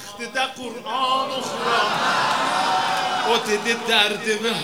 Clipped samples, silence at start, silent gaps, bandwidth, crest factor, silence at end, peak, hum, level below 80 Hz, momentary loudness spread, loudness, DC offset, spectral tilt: under 0.1%; 0 s; none; over 20 kHz; 20 dB; 0 s; -2 dBFS; none; -64 dBFS; 8 LU; -21 LUFS; 0.2%; -2 dB/octave